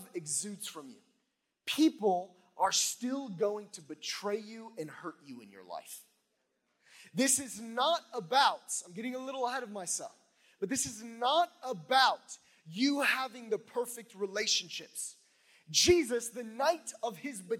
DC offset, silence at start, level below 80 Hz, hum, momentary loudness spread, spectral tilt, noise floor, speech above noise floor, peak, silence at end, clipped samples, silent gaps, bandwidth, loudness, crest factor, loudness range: under 0.1%; 0 s; -70 dBFS; none; 18 LU; -2 dB/octave; -81 dBFS; 48 dB; -10 dBFS; 0 s; under 0.1%; none; 17 kHz; -32 LUFS; 24 dB; 7 LU